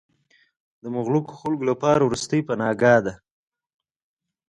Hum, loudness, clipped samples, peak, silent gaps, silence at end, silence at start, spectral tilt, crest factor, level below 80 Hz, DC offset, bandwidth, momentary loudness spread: none; -22 LUFS; under 0.1%; -4 dBFS; none; 1.35 s; 0.85 s; -6 dB/octave; 20 dB; -58 dBFS; under 0.1%; 11.5 kHz; 12 LU